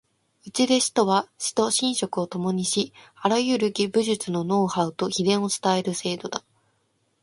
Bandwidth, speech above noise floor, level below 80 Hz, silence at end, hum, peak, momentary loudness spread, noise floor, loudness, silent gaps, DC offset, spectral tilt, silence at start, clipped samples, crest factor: 11.5 kHz; 46 dB; -68 dBFS; 0.85 s; none; -6 dBFS; 8 LU; -70 dBFS; -24 LUFS; none; under 0.1%; -4 dB/octave; 0.45 s; under 0.1%; 18 dB